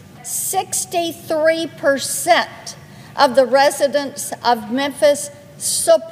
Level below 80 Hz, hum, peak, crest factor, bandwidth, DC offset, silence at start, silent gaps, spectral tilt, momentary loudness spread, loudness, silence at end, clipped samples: -64 dBFS; none; 0 dBFS; 18 dB; 16 kHz; under 0.1%; 0.15 s; none; -2 dB/octave; 11 LU; -17 LUFS; 0 s; under 0.1%